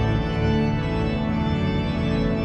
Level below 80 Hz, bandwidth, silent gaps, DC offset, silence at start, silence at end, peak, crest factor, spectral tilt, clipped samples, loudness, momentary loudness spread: -32 dBFS; 8.4 kHz; none; under 0.1%; 0 s; 0 s; -10 dBFS; 12 dB; -8 dB/octave; under 0.1%; -23 LUFS; 2 LU